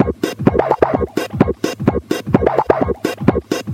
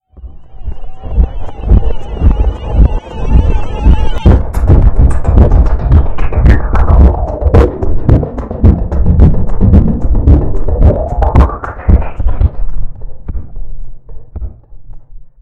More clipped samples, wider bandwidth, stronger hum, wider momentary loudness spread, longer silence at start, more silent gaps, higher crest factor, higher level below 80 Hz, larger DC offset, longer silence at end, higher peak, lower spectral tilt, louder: second, under 0.1% vs 4%; first, 16.5 kHz vs 4.2 kHz; neither; second, 5 LU vs 18 LU; second, 0 s vs 0.2 s; neither; first, 16 dB vs 8 dB; second, -34 dBFS vs -10 dBFS; neither; second, 0 s vs 0.15 s; about the same, 0 dBFS vs 0 dBFS; second, -7 dB/octave vs -9.5 dB/octave; second, -17 LUFS vs -11 LUFS